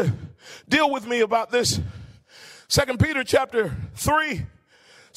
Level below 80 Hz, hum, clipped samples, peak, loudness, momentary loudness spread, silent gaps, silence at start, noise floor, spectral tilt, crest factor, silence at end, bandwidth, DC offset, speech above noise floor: -44 dBFS; none; under 0.1%; -6 dBFS; -22 LUFS; 15 LU; none; 0 s; -54 dBFS; -4 dB/octave; 18 dB; 0.7 s; 16 kHz; under 0.1%; 31 dB